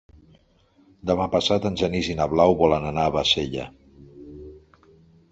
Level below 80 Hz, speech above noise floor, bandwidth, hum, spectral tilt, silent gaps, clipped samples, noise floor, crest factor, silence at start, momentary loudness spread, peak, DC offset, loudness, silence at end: -44 dBFS; 38 dB; 8 kHz; none; -5 dB/octave; none; under 0.1%; -60 dBFS; 20 dB; 1.05 s; 23 LU; -4 dBFS; under 0.1%; -22 LUFS; 0.75 s